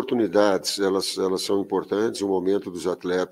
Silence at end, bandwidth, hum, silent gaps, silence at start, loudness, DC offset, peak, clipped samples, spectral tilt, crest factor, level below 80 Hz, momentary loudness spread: 0.05 s; 16 kHz; none; none; 0 s; -24 LUFS; under 0.1%; -6 dBFS; under 0.1%; -4 dB/octave; 18 dB; -66 dBFS; 6 LU